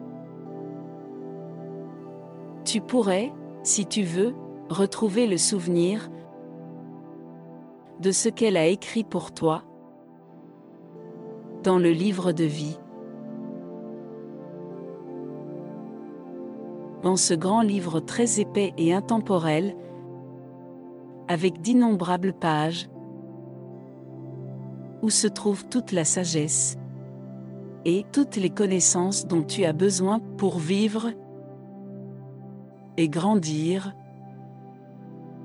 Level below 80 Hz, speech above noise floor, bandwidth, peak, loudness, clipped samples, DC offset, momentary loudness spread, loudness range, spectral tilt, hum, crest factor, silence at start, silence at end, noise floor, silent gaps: -70 dBFS; 25 dB; 12 kHz; -8 dBFS; -24 LUFS; under 0.1%; under 0.1%; 21 LU; 6 LU; -4.5 dB/octave; none; 18 dB; 0 s; 0 s; -49 dBFS; none